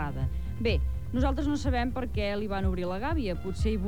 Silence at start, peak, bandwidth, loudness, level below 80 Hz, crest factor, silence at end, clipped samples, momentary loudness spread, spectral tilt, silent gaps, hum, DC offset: 0 s; -14 dBFS; 10.5 kHz; -30 LUFS; -34 dBFS; 14 dB; 0 s; under 0.1%; 4 LU; -7 dB/octave; none; none; 1%